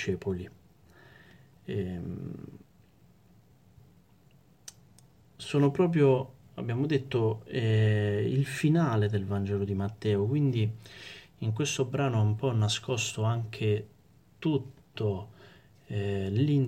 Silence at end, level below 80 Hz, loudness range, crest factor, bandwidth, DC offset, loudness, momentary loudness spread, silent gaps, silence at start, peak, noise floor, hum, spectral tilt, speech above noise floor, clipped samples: 0 s; -64 dBFS; 14 LU; 16 dB; 12.5 kHz; under 0.1%; -29 LUFS; 19 LU; none; 0 s; -14 dBFS; -61 dBFS; none; -6.5 dB/octave; 33 dB; under 0.1%